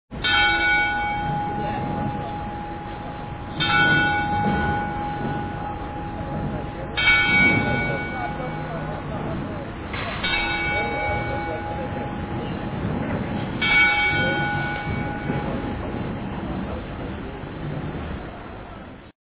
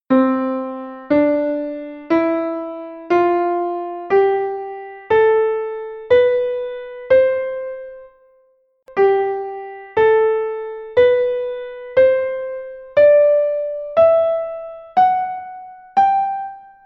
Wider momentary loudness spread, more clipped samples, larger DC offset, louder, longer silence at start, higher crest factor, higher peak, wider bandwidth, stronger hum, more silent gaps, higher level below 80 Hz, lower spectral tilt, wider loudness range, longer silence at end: about the same, 15 LU vs 16 LU; neither; neither; second, -23 LUFS vs -17 LUFS; about the same, 0.1 s vs 0.1 s; first, 20 dB vs 14 dB; about the same, -6 dBFS vs -4 dBFS; second, 4 kHz vs 6 kHz; neither; neither; first, -38 dBFS vs -56 dBFS; first, -9 dB/octave vs -7.5 dB/octave; first, 8 LU vs 4 LU; second, 0.1 s vs 0.25 s